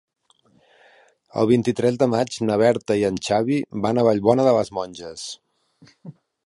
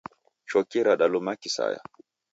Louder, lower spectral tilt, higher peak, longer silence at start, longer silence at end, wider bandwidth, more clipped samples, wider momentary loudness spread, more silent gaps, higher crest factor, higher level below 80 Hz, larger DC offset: first, -20 LUFS vs -25 LUFS; first, -6 dB/octave vs -3.5 dB/octave; first, -2 dBFS vs -10 dBFS; first, 1.35 s vs 0.5 s; second, 0.35 s vs 0.55 s; first, 11.5 kHz vs 8 kHz; neither; first, 15 LU vs 11 LU; neither; about the same, 20 dB vs 18 dB; first, -58 dBFS vs -76 dBFS; neither